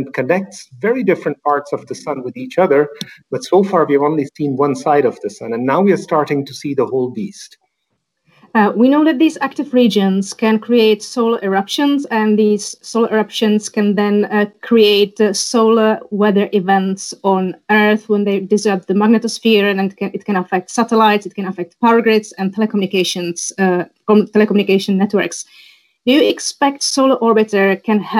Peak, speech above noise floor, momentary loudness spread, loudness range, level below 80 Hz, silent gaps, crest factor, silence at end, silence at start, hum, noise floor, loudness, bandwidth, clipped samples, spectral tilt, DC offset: -2 dBFS; 56 dB; 9 LU; 3 LU; -68 dBFS; none; 14 dB; 0 s; 0 s; none; -71 dBFS; -15 LUFS; 15 kHz; under 0.1%; -5 dB/octave; under 0.1%